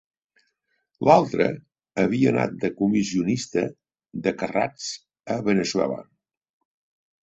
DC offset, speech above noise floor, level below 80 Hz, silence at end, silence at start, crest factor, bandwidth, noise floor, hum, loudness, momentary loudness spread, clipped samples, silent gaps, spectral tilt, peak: under 0.1%; 51 dB; -60 dBFS; 1.2 s; 1 s; 22 dB; 8.2 kHz; -74 dBFS; none; -23 LUFS; 15 LU; under 0.1%; none; -5.5 dB/octave; -2 dBFS